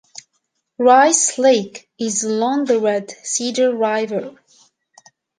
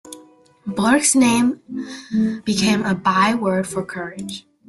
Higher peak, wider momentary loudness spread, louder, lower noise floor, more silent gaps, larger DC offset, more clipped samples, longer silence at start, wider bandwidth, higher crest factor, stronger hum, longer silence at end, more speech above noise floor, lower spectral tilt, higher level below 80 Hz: about the same, -2 dBFS vs -4 dBFS; second, 13 LU vs 16 LU; about the same, -17 LUFS vs -18 LUFS; first, -71 dBFS vs -48 dBFS; neither; neither; neither; first, 0.8 s vs 0.05 s; second, 10.5 kHz vs 12.5 kHz; about the same, 16 dB vs 16 dB; neither; first, 1.1 s vs 0.3 s; first, 54 dB vs 30 dB; second, -2.5 dB/octave vs -4 dB/octave; second, -72 dBFS vs -56 dBFS